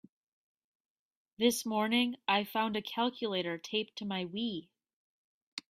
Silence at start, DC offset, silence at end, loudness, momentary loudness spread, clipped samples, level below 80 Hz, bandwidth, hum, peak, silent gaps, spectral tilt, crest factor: 1.4 s; under 0.1%; 0.1 s; -33 LUFS; 8 LU; under 0.1%; -78 dBFS; 15.5 kHz; none; -16 dBFS; 4.93-5.57 s; -3.5 dB/octave; 20 dB